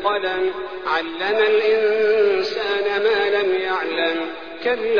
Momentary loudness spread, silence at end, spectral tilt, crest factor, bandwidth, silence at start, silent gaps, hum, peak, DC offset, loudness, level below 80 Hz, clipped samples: 7 LU; 0 s; -4 dB/octave; 12 dB; 5.4 kHz; 0 s; none; none; -6 dBFS; 0.5%; -20 LUFS; -58 dBFS; under 0.1%